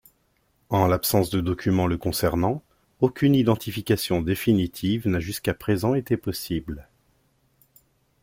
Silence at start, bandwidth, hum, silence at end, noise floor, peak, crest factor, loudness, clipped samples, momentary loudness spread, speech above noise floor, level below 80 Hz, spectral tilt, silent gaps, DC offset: 0.7 s; 16.5 kHz; none; 1.4 s; -67 dBFS; -6 dBFS; 20 dB; -24 LUFS; under 0.1%; 8 LU; 44 dB; -48 dBFS; -6 dB/octave; none; under 0.1%